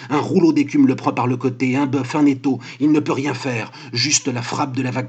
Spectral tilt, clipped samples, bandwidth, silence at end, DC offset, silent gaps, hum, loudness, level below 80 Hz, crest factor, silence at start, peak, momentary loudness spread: -4.5 dB/octave; under 0.1%; 9.2 kHz; 0 s; under 0.1%; none; none; -19 LUFS; -80 dBFS; 16 dB; 0 s; -2 dBFS; 7 LU